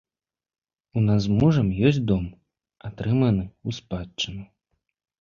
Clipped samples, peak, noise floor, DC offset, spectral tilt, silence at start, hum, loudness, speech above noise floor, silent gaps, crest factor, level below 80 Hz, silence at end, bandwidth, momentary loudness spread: under 0.1%; -6 dBFS; under -90 dBFS; under 0.1%; -7.5 dB/octave; 0.95 s; none; -24 LUFS; over 68 dB; none; 20 dB; -46 dBFS; 0.75 s; 7.2 kHz; 15 LU